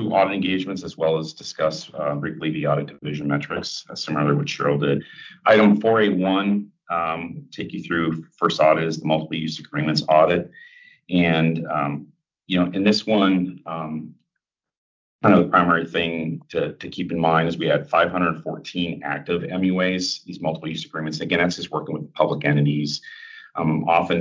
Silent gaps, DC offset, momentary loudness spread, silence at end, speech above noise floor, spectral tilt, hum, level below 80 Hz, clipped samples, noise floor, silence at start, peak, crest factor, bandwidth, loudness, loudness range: 14.78-15.19 s; under 0.1%; 12 LU; 0 s; 61 dB; -6 dB/octave; none; -56 dBFS; under 0.1%; -83 dBFS; 0 s; -4 dBFS; 18 dB; 7.6 kHz; -22 LUFS; 4 LU